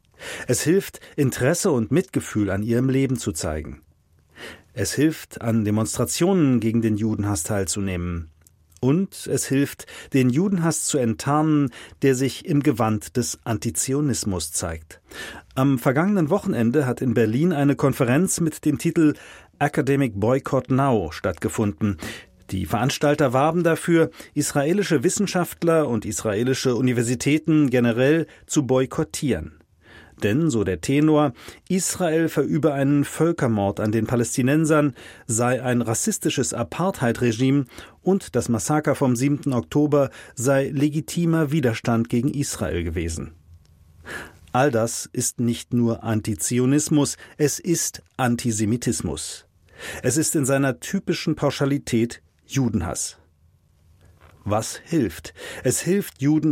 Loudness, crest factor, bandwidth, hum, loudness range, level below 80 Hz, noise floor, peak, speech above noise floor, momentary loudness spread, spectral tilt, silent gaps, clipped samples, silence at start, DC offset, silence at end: -22 LUFS; 16 dB; 16.5 kHz; none; 4 LU; -48 dBFS; -59 dBFS; -6 dBFS; 37 dB; 9 LU; -5.5 dB/octave; none; under 0.1%; 0.2 s; under 0.1%; 0 s